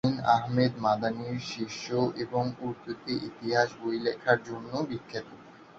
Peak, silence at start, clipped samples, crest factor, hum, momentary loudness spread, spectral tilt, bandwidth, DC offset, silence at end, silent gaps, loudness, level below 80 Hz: -8 dBFS; 0.05 s; under 0.1%; 22 dB; none; 11 LU; -6 dB/octave; 7.8 kHz; under 0.1%; 0 s; none; -30 LUFS; -64 dBFS